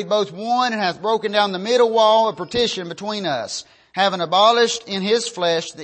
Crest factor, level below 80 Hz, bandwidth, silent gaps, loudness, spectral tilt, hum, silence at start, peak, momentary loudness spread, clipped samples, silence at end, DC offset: 16 dB; -60 dBFS; 8.8 kHz; none; -19 LUFS; -3 dB/octave; none; 0 s; -4 dBFS; 10 LU; under 0.1%; 0 s; under 0.1%